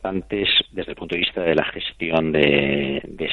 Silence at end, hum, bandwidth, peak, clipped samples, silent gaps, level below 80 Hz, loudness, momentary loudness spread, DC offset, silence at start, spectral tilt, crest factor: 0 s; none; 6.6 kHz; -4 dBFS; under 0.1%; none; -46 dBFS; -20 LUFS; 10 LU; under 0.1%; 0 s; -7 dB/octave; 18 dB